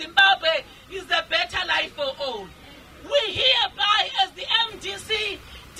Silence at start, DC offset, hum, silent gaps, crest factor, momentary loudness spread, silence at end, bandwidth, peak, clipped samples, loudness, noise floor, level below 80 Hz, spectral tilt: 0 s; under 0.1%; none; none; 18 dB; 15 LU; 0 s; 16 kHz; -6 dBFS; under 0.1%; -21 LUFS; -46 dBFS; -52 dBFS; -1.5 dB/octave